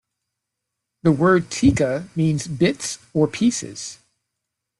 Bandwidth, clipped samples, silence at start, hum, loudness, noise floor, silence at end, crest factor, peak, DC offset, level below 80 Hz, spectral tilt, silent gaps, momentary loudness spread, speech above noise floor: 12 kHz; under 0.1%; 1.05 s; none; -20 LUFS; -81 dBFS; 0.85 s; 18 dB; -4 dBFS; under 0.1%; -48 dBFS; -5.5 dB/octave; none; 11 LU; 62 dB